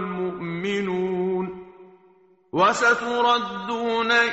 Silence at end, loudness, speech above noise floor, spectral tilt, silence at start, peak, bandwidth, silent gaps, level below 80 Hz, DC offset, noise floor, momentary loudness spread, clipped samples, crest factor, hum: 0 s; -23 LUFS; 35 dB; -2.5 dB/octave; 0 s; -6 dBFS; 8 kHz; none; -62 dBFS; under 0.1%; -57 dBFS; 10 LU; under 0.1%; 18 dB; none